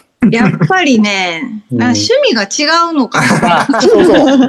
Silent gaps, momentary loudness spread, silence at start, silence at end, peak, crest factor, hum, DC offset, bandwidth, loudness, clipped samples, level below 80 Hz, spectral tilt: none; 7 LU; 0.2 s; 0 s; 0 dBFS; 10 dB; none; under 0.1%; 12.5 kHz; -10 LUFS; under 0.1%; -44 dBFS; -4.5 dB/octave